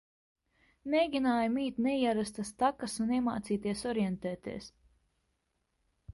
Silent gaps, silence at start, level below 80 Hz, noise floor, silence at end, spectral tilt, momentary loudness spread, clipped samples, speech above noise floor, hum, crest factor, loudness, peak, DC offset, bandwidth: none; 0.85 s; -64 dBFS; -80 dBFS; 0 s; -5.5 dB/octave; 12 LU; under 0.1%; 48 dB; none; 18 dB; -32 LUFS; -16 dBFS; under 0.1%; 11.5 kHz